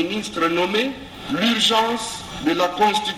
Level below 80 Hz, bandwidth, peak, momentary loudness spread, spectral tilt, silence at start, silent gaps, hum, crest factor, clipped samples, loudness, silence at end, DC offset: -50 dBFS; 16 kHz; -4 dBFS; 10 LU; -3 dB/octave; 0 s; none; none; 16 dB; under 0.1%; -20 LUFS; 0 s; under 0.1%